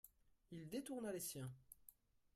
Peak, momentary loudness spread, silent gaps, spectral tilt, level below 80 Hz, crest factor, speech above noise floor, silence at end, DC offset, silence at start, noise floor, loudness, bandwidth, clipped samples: -36 dBFS; 18 LU; none; -4.5 dB/octave; -78 dBFS; 16 dB; 21 dB; 0.45 s; under 0.1%; 0.05 s; -71 dBFS; -50 LUFS; 16 kHz; under 0.1%